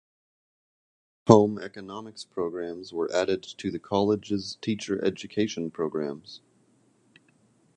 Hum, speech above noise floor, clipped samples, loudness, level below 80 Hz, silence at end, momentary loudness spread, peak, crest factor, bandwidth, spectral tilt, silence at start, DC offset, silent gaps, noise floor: none; 38 dB; under 0.1%; -27 LUFS; -62 dBFS; 1.4 s; 20 LU; 0 dBFS; 28 dB; 9.6 kHz; -6 dB/octave; 1.25 s; under 0.1%; none; -64 dBFS